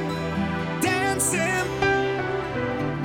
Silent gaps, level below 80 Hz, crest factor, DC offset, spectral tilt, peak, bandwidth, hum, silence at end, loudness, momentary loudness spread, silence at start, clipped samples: none; -46 dBFS; 16 dB; under 0.1%; -4 dB/octave; -8 dBFS; 19 kHz; none; 0 s; -24 LUFS; 5 LU; 0 s; under 0.1%